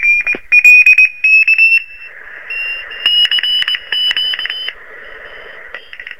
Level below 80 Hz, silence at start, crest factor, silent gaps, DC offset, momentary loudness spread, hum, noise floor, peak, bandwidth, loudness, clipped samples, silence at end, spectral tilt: -52 dBFS; 0 s; 12 dB; none; 1%; 25 LU; none; -33 dBFS; 0 dBFS; 16.5 kHz; -8 LUFS; 0.2%; 0.05 s; 1.5 dB/octave